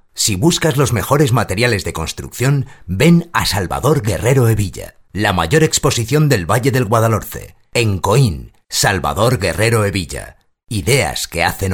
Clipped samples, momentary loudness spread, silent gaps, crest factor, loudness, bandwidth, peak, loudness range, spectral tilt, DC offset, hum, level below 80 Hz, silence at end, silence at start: under 0.1%; 10 LU; none; 16 dB; -15 LUFS; 18 kHz; 0 dBFS; 2 LU; -5 dB/octave; under 0.1%; none; -36 dBFS; 0 s; 0.15 s